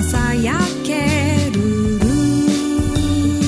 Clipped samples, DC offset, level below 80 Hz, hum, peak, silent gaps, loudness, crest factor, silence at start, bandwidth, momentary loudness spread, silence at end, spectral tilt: under 0.1%; under 0.1%; -28 dBFS; none; -4 dBFS; none; -17 LUFS; 14 dB; 0 s; 11 kHz; 3 LU; 0 s; -5.5 dB/octave